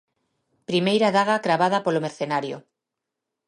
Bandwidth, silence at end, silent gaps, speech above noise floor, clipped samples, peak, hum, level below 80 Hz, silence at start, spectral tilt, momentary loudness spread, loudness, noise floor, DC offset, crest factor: 11.5 kHz; 0.85 s; none; 63 dB; under 0.1%; -8 dBFS; none; -74 dBFS; 0.7 s; -5.5 dB/octave; 14 LU; -22 LUFS; -84 dBFS; under 0.1%; 18 dB